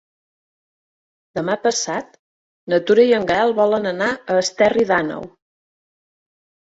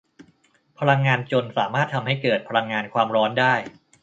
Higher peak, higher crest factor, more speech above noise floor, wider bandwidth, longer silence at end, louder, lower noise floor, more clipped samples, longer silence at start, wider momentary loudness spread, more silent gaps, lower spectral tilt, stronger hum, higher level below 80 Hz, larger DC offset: about the same, -2 dBFS vs -2 dBFS; about the same, 18 dB vs 20 dB; first, over 72 dB vs 39 dB; about the same, 8 kHz vs 7.8 kHz; first, 1.35 s vs 0.3 s; first, -18 LUFS vs -22 LUFS; first, under -90 dBFS vs -61 dBFS; neither; first, 1.35 s vs 0.2 s; first, 12 LU vs 6 LU; first, 2.19-2.67 s vs none; second, -3.5 dB/octave vs -6.5 dB/octave; neither; first, -58 dBFS vs -66 dBFS; neither